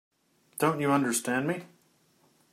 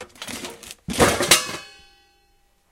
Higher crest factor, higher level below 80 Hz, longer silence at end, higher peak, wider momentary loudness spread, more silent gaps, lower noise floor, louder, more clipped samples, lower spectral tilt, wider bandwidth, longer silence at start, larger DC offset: about the same, 20 dB vs 24 dB; second, -76 dBFS vs -44 dBFS; second, 0.85 s vs 1 s; second, -10 dBFS vs 0 dBFS; second, 11 LU vs 19 LU; neither; first, -66 dBFS vs -62 dBFS; second, -28 LUFS vs -19 LUFS; neither; first, -4.5 dB/octave vs -2 dB/octave; about the same, 16 kHz vs 17 kHz; first, 0.55 s vs 0 s; neither